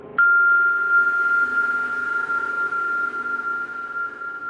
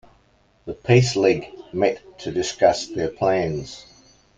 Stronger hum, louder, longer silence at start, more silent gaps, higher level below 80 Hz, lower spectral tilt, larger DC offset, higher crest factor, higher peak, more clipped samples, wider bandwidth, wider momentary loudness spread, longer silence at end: neither; about the same, -20 LUFS vs -21 LUFS; second, 0 s vs 0.65 s; neither; second, -68 dBFS vs -52 dBFS; second, -3.5 dB/octave vs -5.5 dB/octave; neither; second, 12 dB vs 20 dB; second, -10 dBFS vs -2 dBFS; neither; about the same, 8.8 kHz vs 9.2 kHz; second, 12 LU vs 17 LU; second, 0 s vs 0.55 s